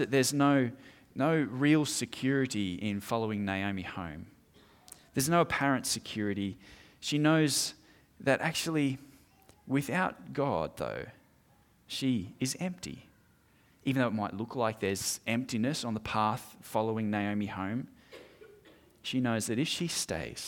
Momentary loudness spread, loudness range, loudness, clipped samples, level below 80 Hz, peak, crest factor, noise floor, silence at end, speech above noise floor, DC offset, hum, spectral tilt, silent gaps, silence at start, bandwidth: 13 LU; 5 LU; -31 LUFS; under 0.1%; -64 dBFS; -14 dBFS; 18 dB; -65 dBFS; 0 s; 34 dB; under 0.1%; none; -4.5 dB/octave; none; 0 s; 18.5 kHz